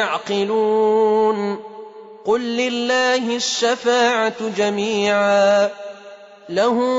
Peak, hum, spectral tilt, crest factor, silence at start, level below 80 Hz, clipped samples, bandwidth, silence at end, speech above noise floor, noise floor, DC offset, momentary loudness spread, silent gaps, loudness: -6 dBFS; none; -3.5 dB/octave; 12 dB; 0 s; -66 dBFS; under 0.1%; 8 kHz; 0 s; 23 dB; -41 dBFS; under 0.1%; 14 LU; none; -18 LUFS